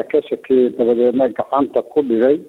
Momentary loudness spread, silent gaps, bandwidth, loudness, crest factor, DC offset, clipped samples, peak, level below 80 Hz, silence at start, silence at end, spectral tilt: 4 LU; none; 4.1 kHz; -17 LUFS; 12 dB; under 0.1%; under 0.1%; -4 dBFS; -58 dBFS; 0 s; 0.05 s; -8 dB/octave